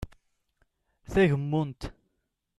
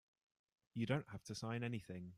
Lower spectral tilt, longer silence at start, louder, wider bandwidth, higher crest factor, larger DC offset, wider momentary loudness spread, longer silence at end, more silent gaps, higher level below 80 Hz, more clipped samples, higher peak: first, -7.5 dB/octave vs -6 dB/octave; second, 0 s vs 0.75 s; first, -27 LUFS vs -45 LUFS; second, 12 kHz vs 14 kHz; about the same, 20 dB vs 20 dB; neither; first, 19 LU vs 8 LU; first, 0.7 s vs 0 s; neither; first, -48 dBFS vs -76 dBFS; neither; first, -12 dBFS vs -26 dBFS